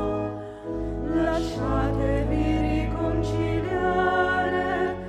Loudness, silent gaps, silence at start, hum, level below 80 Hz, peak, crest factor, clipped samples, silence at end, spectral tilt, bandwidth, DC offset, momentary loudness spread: -25 LUFS; none; 0 s; none; -34 dBFS; -10 dBFS; 14 dB; under 0.1%; 0 s; -7.5 dB/octave; 10.5 kHz; under 0.1%; 8 LU